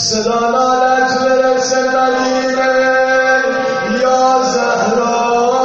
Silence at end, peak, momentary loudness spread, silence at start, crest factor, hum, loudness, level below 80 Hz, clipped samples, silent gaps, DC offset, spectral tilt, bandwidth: 0 s; 0 dBFS; 3 LU; 0 s; 12 dB; none; -13 LUFS; -50 dBFS; under 0.1%; none; under 0.1%; -1.5 dB/octave; 8 kHz